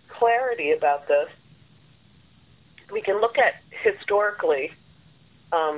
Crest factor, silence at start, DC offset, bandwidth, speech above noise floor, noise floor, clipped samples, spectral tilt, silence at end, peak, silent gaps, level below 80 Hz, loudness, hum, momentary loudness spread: 18 dB; 0.1 s; under 0.1%; 4 kHz; 33 dB; -56 dBFS; under 0.1%; -7 dB/octave; 0 s; -8 dBFS; none; -66 dBFS; -23 LUFS; none; 8 LU